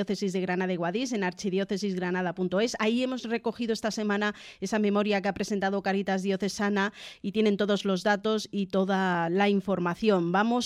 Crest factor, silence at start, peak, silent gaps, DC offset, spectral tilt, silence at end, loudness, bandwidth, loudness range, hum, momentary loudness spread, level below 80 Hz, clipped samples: 16 dB; 0 s; -12 dBFS; none; under 0.1%; -5.5 dB/octave; 0 s; -28 LUFS; 13 kHz; 3 LU; none; 5 LU; -64 dBFS; under 0.1%